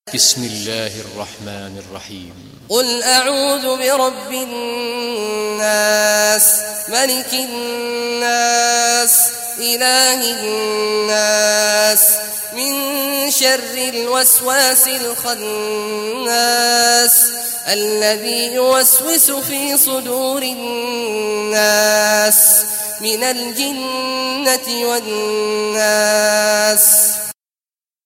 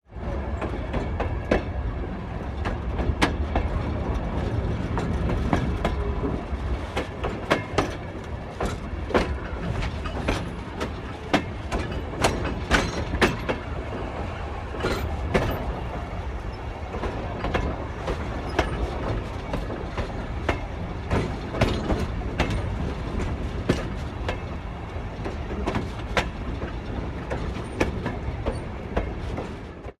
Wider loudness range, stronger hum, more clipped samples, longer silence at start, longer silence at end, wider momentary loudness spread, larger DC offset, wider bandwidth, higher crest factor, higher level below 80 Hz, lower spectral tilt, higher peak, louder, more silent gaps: about the same, 5 LU vs 4 LU; neither; neither; about the same, 0.05 s vs 0.1 s; first, 0.75 s vs 0.05 s; first, 12 LU vs 8 LU; neither; first, 16.5 kHz vs 14.5 kHz; second, 16 dB vs 22 dB; second, -62 dBFS vs -32 dBFS; second, -0.5 dB/octave vs -6 dB/octave; first, 0 dBFS vs -4 dBFS; first, -13 LUFS vs -28 LUFS; neither